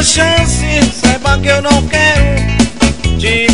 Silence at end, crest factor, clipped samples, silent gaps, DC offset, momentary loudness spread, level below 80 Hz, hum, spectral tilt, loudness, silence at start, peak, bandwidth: 0 s; 10 dB; under 0.1%; none; 4%; 4 LU; -18 dBFS; none; -4 dB/octave; -10 LUFS; 0 s; 0 dBFS; 11 kHz